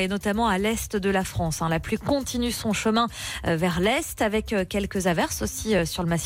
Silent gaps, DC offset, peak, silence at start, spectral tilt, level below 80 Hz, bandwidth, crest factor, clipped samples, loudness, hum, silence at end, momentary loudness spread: none; under 0.1%; -12 dBFS; 0 s; -4.5 dB/octave; -42 dBFS; 16.5 kHz; 14 dB; under 0.1%; -25 LUFS; none; 0 s; 4 LU